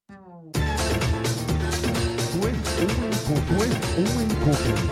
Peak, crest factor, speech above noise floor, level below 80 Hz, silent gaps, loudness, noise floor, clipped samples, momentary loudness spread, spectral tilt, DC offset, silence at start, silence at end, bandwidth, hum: -8 dBFS; 16 dB; 23 dB; -32 dBFS; none; -24 LUFS; -45 dBFS; under 0.1%; 3 LU; -5 dB/octave; under 0.1%; 0.1 s; 0 s; 16 kHz; none